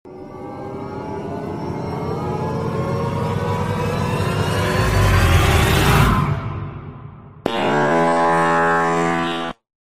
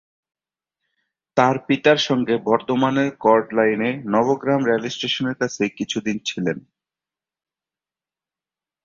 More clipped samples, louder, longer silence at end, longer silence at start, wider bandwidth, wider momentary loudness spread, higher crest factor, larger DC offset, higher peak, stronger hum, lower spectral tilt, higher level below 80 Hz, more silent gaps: neither; about the same, -19 LUFS vs -20 LUFS; second, 0.45 s vs 2.25 s; second, 0.05 s vs 1.35 s; first, 15.5 kHz vs 7.6 kHz; first, 16 LU vs 8 LU; about the same, 18 dB vs 20 dB; neither; about the same, -2 dBFS vs -2 dBFS; neither; about the same, -5.5 dB/octave vs -5 dB/octave; first, -30 dBFS vs -62 dBFS; neither